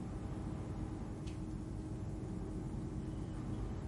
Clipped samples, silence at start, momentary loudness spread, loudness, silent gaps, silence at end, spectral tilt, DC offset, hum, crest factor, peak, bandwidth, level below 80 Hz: under 0.1%; 0 s; 1 LU; -44 LUFS; none; 0 s; -8 dB/octave; under 0.1%; none; 14 dB; -30 dBFS; 11.5 kHz; -48 dBFS